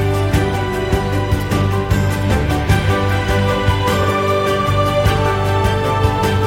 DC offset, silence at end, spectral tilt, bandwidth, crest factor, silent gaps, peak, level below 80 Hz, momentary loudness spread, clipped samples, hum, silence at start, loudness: under 0.1%; 0 s; -6 dB/octave; 16.5 kHz; 14 dB; none; -2 dBFS; -26 dBFS; 3 LU; under 0.1%; none; 0 s; -16 LUFS